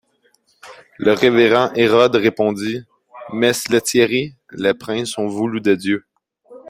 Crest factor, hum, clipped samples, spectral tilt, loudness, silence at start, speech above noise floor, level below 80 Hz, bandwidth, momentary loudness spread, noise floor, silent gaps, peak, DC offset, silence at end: 16 dB; none; under 0.1%; -4.5 dB/octave; -17 LUFS; 0.65 s; 44 dB; -58 dBFS; 16 kHz; 11 LU; -60 dBFS; none; -2 dBFS; under 0.1%; 0 s